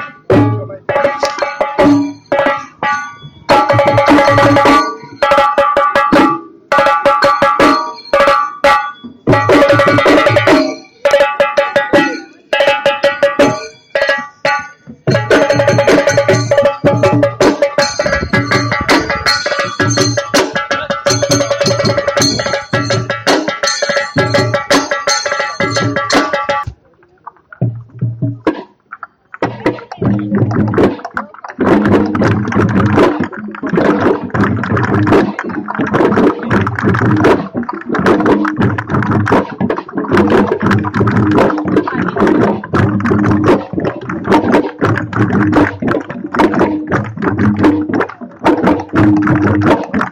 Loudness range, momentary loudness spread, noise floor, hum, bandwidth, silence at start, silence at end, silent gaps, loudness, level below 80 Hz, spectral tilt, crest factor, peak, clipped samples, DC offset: 4 LU; 9 LU; -49 dBFS; none; 15.5 kHz; 0 s; 0 s; none; -12 LUFS; -40 dBFS; -5 dB/octave; 12 dB; 0 dBFS; under 0.1%; under 0.1%